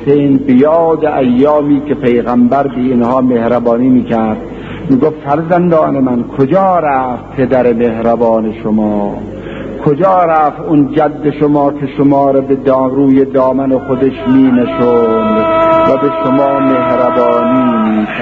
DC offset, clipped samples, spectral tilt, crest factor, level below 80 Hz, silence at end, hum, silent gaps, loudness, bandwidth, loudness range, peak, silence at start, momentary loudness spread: under 0.1%; under 0.1%; -9.5 dB/octave; 10 dB; -40 dBFS; 0 s; none; none; -10 LUFS; 4.6 kHz; 2 LU; 0 dBFS; 0 s; 6 LU